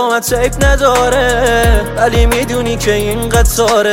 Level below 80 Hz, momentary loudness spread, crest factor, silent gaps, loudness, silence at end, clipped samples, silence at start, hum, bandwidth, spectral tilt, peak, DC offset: -18 dBFS; 4 LU; 10 dB; none; -12 LUFS; 0 s; under 0.1%; 0 s; none; 17 kHz; -4 dB/octave; 0 dBFS; under 0.1%